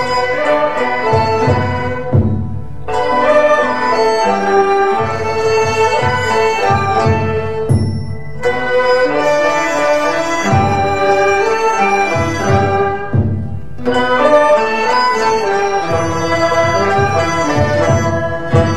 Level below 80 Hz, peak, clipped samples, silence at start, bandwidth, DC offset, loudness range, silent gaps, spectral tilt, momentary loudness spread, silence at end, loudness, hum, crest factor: -38 dBFS; 0 dBFS; under 0.1%; 0 s; 12.5 kHz; 4%; 2 LU; none; -5.5 dB/octave; 6 LU; 0 s; -14 LUFS; none; 14 dB